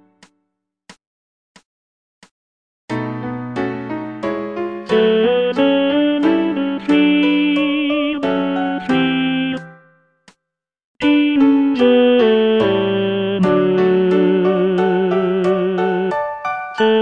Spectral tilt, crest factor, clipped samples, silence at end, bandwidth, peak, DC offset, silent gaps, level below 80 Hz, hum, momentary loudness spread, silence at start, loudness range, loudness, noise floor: -7.5 dB/octave; 16 dB; under 0.1%; 0 s; 7.4 kHz; -2 dBFS; 0.1%; 1.07-1.55 s, 1.65-2.22 s, 2.31-2.88 s, 10.84-10.95 s; -56 dBFS; none; 10 LU; 0.9 s; 12 LU; -16 LUFS; -80 dBFS